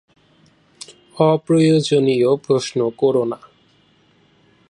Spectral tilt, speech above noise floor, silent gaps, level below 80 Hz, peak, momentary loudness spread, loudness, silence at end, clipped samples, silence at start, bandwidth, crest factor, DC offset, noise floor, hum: -6.5 dB/octave; 40 dB; none; -64 dBFS; -2 dBFS; 23 LU; -17 LUFS; 1.35 s; under 0.1%; 1.15 s; 11 kHz; 16 dB; under 0.1%; -56 dBFS; none